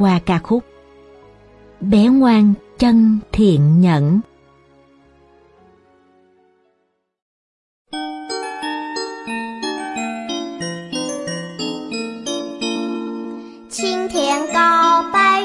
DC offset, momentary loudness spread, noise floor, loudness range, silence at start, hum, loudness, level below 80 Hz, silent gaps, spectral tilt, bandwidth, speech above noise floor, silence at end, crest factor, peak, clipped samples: under 0.1%; 15 LU; -67 dBFS; 15 LU; 0 s; none; -17 LUFS; -46 dBFS; 7.22-7.85 s; -6 dB/octave; 11.5 kHz; 55 dB; 0 s; 16 dB; -2 dBFS; under 0.1%